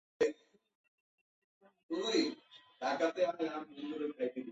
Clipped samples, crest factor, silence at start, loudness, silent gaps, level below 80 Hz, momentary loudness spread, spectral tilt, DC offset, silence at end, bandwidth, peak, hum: under 0.1%; 20 dB; 0.2 s; -37 LUFS; 0.75-1.61 s, 1.83-1.89 s; -82 dBFS; 10 LU; -1.5 dB/octave; under 0.1%; 0 s; 8 kHz; -18 dBFS; none